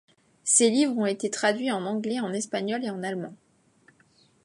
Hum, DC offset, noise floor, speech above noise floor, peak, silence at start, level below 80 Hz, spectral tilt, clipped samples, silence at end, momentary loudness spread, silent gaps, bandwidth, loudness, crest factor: none; under 0.1%; -62 dBFS; 36 dB; -4 dBFS; 0.45 s; -80 dBFS; -3 dB/octave; under 0.1%; 1.1 s; 13 LU; none; 11.5 kHz; -26 LUFS; 22 dB